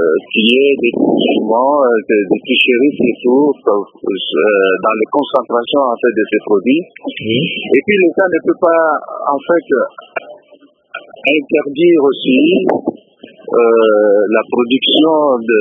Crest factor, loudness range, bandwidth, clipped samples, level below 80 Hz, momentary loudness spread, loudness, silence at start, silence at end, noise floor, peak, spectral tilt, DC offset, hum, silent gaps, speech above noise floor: 12 dB; 3 LU; 3.9 kHz; under 0.1%; -62 dBFS; 8 LU; -12 LUFS; 0 s; 0 s; -46 dBFS; 0 dBFS; -7.5 dB/octave; under 0.1%; none; none; 34 dB